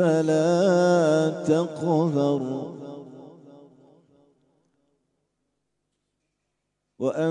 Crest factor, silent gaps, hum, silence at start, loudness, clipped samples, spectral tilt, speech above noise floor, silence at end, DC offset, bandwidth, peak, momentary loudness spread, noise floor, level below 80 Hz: 16 dB; none; 50 Hz at -70 dBFS; 0 s; -22 LUFS; under 0.1%; -7 dB/octave; 57 dB; 0 s; under 0.1%; 10.5 kHz; -8 dBFS; 19 LU; -79 dBFS; -76 dBFS